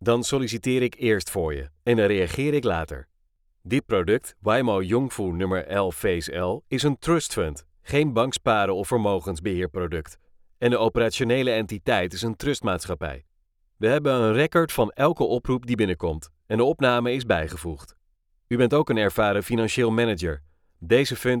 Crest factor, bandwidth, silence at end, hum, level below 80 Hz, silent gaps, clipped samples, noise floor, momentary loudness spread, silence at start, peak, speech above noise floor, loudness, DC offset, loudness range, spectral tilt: 18 dB; 18 kHz; 0 s; none; -46 dBFS; none; under 0.1%; -67 dBFS; 9 LU; 0 s; -6 dBFS; 44 dB; -24 LUFS; under 0.1%; 2 LU; -5.5 dB/octave